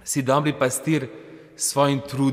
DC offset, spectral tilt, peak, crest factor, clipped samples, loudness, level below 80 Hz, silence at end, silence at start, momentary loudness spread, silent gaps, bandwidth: under 0.1%; -4.5 dB/octave; -6 dBFS; 16 dB; under 0.1%; -22 LUFS; -62 dBFS; 0 s; 0.05 s; 8 LU; none; 16 kHz